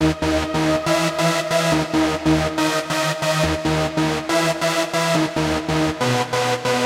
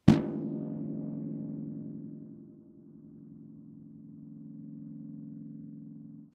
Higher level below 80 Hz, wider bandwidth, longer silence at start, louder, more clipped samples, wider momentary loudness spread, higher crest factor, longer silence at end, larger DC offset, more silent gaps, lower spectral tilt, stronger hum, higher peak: first, -38 dBFS vs -60 dBFS; first, 16.5 kHz vs 8.4 kHz; about the same, 0 s vs 0.05 s; first, -19 LUFS vs -37 LUFS; neither; second, 2 LU vs 15 LU; second, 14 dB vs 32 dB; about the same, 0 s vs 0.05 s; neither; neither; second, -4.5 dB/octave vs -8.5 dB/octave; neither; about the same, -4 dBFS vs -4 dBFS